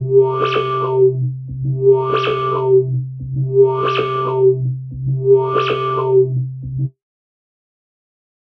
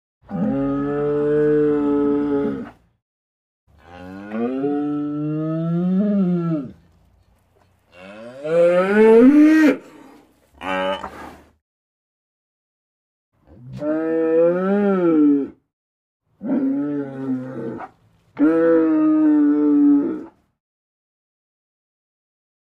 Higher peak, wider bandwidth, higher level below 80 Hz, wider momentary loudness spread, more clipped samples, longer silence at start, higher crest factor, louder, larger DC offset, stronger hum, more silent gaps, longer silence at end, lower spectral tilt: about the same, -2 dBFS vs -4 dBFS; second, 6 kHz vs 7 kHz; first, -48 dBFS vs -56 dBFS; second, 10 LU vs 18 LU; neither; second, 0 s vs 0.3 s; about the same, 14 dB vs 16 dB; about the same, -16 LUFS vs -18 LUFS; neither; neither; second, none vs 3.02-3.67 s, 11.61-13.32 s, 15.73-16.20 s; second, 1.7 s vs 2.3 s; about the same, -9 dB/octave vs -8.5 dB/octave